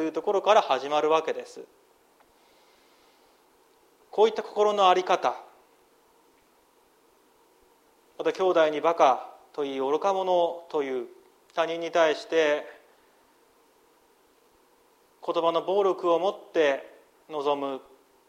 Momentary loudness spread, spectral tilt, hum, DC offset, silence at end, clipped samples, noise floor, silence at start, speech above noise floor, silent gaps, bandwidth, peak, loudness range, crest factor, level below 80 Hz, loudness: 14 LU; -4 dB/octave; none; under 0.1%; 0.5 s; under 0.1%; -63 dBFS; 0 s; 38 dB; none; 15 kHz; -6 dBFS; 7 LU; 22 dB; -80 dBFS; -25 LUFS